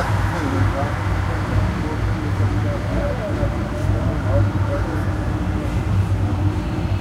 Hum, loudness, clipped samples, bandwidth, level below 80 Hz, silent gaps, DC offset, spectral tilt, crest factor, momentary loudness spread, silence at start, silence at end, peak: none; -21 LUFS; under 0.1%; 11.5 kHz; -26 dBFS; none; under 0.1%; -7.5 dB/octave; 14 dB; 3 LU; 0 s; 0 s; -6 dBFS